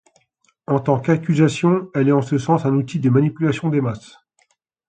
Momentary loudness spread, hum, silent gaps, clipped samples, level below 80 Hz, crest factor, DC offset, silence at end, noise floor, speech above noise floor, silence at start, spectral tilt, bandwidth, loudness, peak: 6 LU; none; none; under 0.1%; -58 dBFS; 16 dB; under 0.1%; 0.9 s; -64 dBFS; 47 dB; 0.7 s; -8 dB/octave; 9.2 kHz; -19 LUFS; -2 dBFS